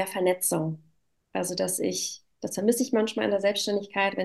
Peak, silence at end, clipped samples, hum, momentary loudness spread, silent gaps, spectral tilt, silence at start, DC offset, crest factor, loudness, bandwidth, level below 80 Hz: -10 dBFS; 0 s; under 0.1%; none; 9 LU; none; -3.5 dB/octave; 0 s; under 0.1%; 18 dB; -27 LUFS; 13 kHz; -74 dBFS